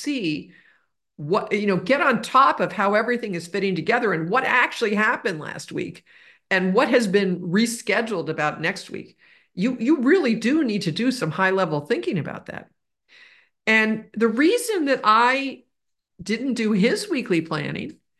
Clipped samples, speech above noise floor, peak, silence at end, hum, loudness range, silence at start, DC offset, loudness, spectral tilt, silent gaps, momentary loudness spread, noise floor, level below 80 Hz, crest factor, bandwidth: under 0.1%; 59 dB; -4 dBFS; 0.25 s; none; 3 LU; 0 s; under 0.1%; -21 LUFS; -5 dB/octave; none; 13 LU; -81 dBFS; -66 dBFS; 18 dB; 12.5 kHz